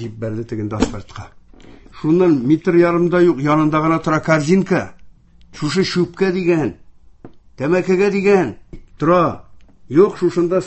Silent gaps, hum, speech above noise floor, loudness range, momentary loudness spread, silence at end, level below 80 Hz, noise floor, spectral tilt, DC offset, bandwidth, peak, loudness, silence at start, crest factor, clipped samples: none; none; 27 dB; 4 LU; 11 LU; 0 s; -44 dBFS; -43 dBFS; -7 dB/octave; under 0.1%; 8.4 kHz; 0 dBFS; -16 LUFS; 0 s; 16 dB; under 0.1%